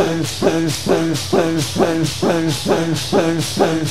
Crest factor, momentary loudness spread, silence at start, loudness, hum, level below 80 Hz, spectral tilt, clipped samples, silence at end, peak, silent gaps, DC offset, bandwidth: 16 dB; 1 LU; 0 s; -17 LUFS; none; -44 dBFS; -5 dB/octave; under 0.1%; 0 s; -2 dBFS; none; 2%; 16 kHz